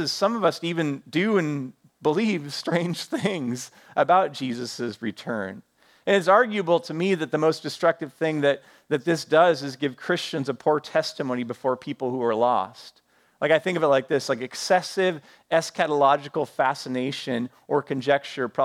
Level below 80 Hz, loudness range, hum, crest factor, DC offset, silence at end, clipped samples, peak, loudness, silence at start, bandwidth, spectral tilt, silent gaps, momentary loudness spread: -76 dBFS; 3 LU; none; 20 dB; under 0.1%; 0 s; under 0.1%; -4 dBFS; -24 LUFS; 0 s; 15.5 kHz; -5 dB/octave; none; 10 LU